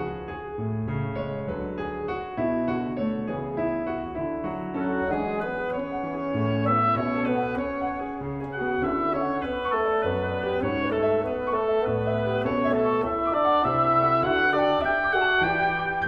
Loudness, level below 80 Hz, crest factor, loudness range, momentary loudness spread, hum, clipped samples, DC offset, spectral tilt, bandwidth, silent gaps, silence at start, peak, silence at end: -25 LUFS; -48 dBFS; 16 dB; 7 LU; 9 LU; none; under 0.1%; under 0.1%; -8.5 dB/octave; 6.2 kHz; none; 0 s; -10 dBFS; 0 s